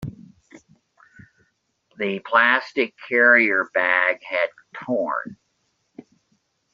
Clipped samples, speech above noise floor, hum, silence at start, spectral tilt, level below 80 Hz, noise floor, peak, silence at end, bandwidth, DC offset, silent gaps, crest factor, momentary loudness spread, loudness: under 0.1%; 50 dB; none; 0 s; -1.5 dB/octave; -64 dBFS; -71 dBFS; -2 dBFS; 1.4 s; 7.4 kHz; under 0.1%; none; 20 dB; 14 LU; -20 LUFS